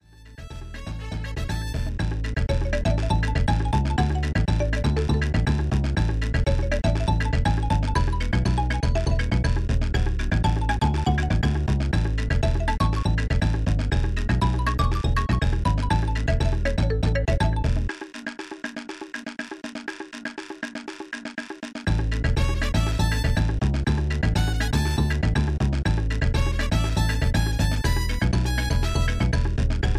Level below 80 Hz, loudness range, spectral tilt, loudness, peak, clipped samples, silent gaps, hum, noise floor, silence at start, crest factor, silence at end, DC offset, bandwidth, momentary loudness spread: -26 dBFS; 5 LU; -6 dB/octave; -25 LUFS; -8 dBFS; under 0.1%; none; none; -42 dBFS; 0.2 s; 14 dB; 0 s; under 0.1%; 14.5 kHz; 11 LU